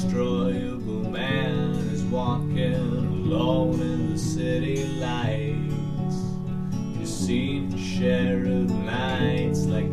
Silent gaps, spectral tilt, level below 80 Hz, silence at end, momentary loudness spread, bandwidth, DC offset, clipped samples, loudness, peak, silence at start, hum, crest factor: none; -6.5 dB/octave; -42 dBFS; 0 s; 6 LU; 13 kHz; under 0.1%; under 0.1%; -26 LUFS; -8 dBFS; 0 s; none; 16 dB